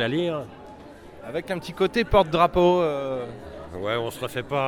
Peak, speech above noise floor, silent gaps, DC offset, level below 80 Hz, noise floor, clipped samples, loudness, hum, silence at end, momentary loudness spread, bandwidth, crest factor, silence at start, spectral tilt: -6 dBFS; 20 dB; none; under 0.1%; -42 dBFS; -44 dBFS; under 0.1%; -24 LUFS; none; 0 s; 22 LU; 17 kHz; 20 dB; 0 s; -6 dB/octave